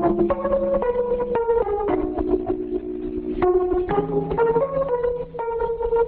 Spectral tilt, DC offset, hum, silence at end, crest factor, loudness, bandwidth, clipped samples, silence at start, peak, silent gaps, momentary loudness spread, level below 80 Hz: -11.5 dB/octave; 0.1%; none; 0 s; 14 dB; -23 LUFS; 4.3 kHz; under 0.1%; 0 s; -8 dBFS; none; 7 LU; -38 dBFS